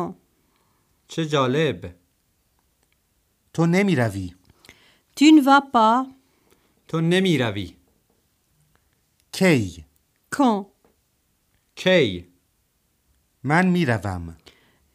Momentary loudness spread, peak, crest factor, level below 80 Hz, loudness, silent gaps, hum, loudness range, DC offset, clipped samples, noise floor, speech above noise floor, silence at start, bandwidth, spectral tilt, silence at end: 19 LU; -4 dBFS; 20 dB; -56 dBFS; -20 LUFS; none; none; 7 LU; under 0.1%; under 0.1%; -68 dBFS; 49 dB; 0 s; 15 kHz; -6 dB/octave; 0.6 s